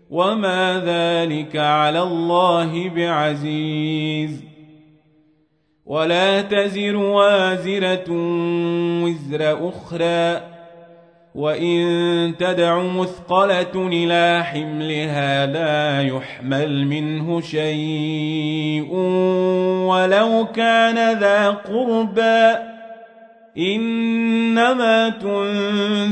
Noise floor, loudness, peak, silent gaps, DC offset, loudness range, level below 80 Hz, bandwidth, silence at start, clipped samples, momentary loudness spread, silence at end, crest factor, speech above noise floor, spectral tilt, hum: -63 dBFS; -19 LUFS; -2 dBFS; none; under 0.1%; 5 LU; -64 dBFS; 9.6 kHz; 0.1 s; under 0.1%; 8 LU; 0 s; 16 dB; 44 dB; -6 dB/octave; none